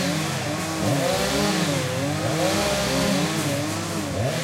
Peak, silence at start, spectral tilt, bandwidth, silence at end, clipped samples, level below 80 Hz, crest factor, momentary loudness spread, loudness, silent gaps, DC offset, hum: -10 dBFS; 0 s; -4 dB/octave; 16 kHz; 0 s; under 0.1%; -46 dBFS; 14 dB; 4 LU; -23 LUFS; none; under 0.1%; none